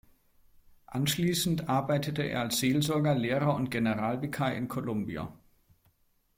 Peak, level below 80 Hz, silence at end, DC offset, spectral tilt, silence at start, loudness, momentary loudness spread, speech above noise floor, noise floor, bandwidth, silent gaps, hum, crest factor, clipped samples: -14 dBFS; -60 dBFS; 1 s; under 0.1%; -5 dB/octave; 0.9 s; -30 LUFS; 7 LU; 40 dB; -70 dBFS; 16.5 kHz; none; none; 16 dB; under 0.1%